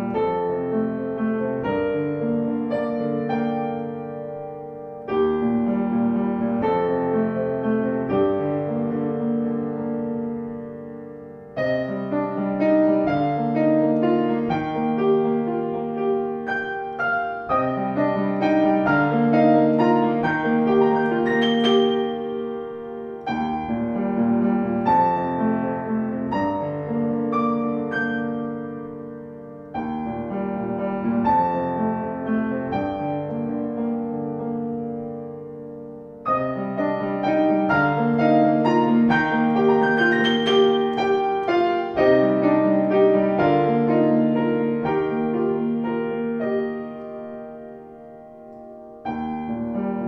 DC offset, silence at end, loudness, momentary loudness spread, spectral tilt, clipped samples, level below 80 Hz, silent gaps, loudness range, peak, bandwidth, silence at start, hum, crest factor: under 0.1%; 0 s; -22 LUFS; 15 LU; -8 dB/octave; under 0.1%; -54 dBFS; none; 8 LU; -4 dBFS; 6.8 kHz; 0 s; none; 16 dB